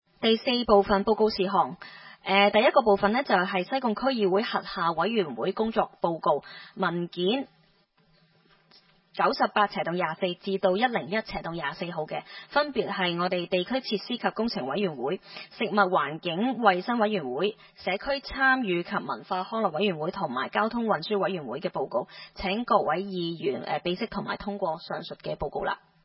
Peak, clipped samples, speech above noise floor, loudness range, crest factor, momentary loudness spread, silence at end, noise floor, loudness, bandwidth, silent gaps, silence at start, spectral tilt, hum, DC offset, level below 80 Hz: -6 dBFS; under 0.1%; 38 dB; 6 LU; 22 dB; 10 LU; 0.3 s; -65 dBFS; -27 LUFS; 5.8 kHz; none; 0.2 s; -9.5 dB/octave; none; under 0.1%; -58 dBFS